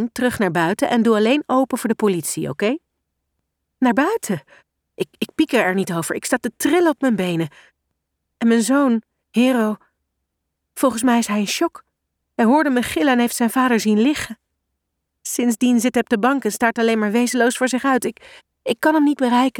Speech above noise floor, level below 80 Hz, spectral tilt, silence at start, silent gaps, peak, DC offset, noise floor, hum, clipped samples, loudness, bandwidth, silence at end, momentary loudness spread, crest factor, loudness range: 59 dB; -58 dBFS; -4.5 dB/octave; 0 s; none; -4 dBFS; under 0.1%; -77 dBFS; none; under 0.1%; -19 LUFS; 18 kHz; 0 s; 9 LU; 16 dB; 3 LU